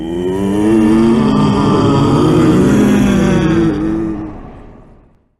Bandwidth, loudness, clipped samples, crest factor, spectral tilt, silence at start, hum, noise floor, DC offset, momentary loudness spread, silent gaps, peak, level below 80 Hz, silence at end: 12.5 kHz; -11 LUFS; under 0.1%; 10 dB; -7.5 dB/octave; 0 s; none; -45 dBFS; under 0.1%; 8 LU; none; -2 dBFS; -30 dBFS; 0.65 s